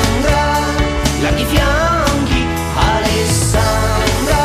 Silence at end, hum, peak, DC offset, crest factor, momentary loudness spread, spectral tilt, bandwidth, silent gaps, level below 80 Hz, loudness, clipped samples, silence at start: 0 s; none; 0 dBFS; under 0.1%; 14 dB; 2 LU; -4.5 dB/octave; 15.5 kHz; none; -20 dBFS; -14 LUFS; under 0.1%; 0 s